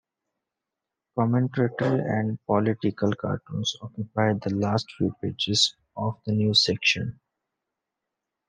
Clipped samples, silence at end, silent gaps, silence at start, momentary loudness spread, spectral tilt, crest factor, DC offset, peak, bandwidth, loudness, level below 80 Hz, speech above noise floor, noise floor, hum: under 0.1%; 1.35 s; none; 1.15 s; 10 LU; -5 dB/octave; 20 dB; under 0.1%; -8 dBFS; 10 kHz; -25 LUFS; -64 dBFS; 61 dB; -86 dBFS; none